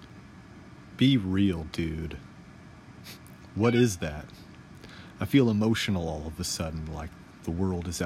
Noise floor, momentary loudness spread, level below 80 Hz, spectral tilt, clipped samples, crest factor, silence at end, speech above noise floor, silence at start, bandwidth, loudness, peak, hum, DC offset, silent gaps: -49 dBFS; 25 LU; -48 dBFS; -5.5 dB/octave; under 0.1%; 20 dB; 0 s; 22 dB; 0 s; 16 kHz; -28 LUFS; -10 dBFS; none; under 0.1%; none